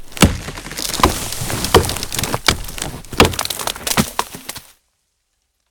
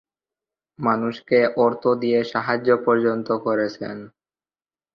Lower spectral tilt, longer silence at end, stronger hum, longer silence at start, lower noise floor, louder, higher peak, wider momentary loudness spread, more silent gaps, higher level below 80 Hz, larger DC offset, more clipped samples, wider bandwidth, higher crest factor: second, -3.5 dB/octave vs -7.5 dB/octave; first, 1.1 s vs 0.85 s; neither; second, 0 s vs 0.8 s; second, -69 dBFS vs under -90 dBFS; first, -18 LUFS vs -21 LUFS; first, 0 dBFS vs -4 dBFS; first, 13 LU vs 8 LU; neither; first, -30 dBFS vs -66 dBFS; neither; neither; first, over 20 kHz vs 6.6 kHz; about the same, 20 dB vs 18 dB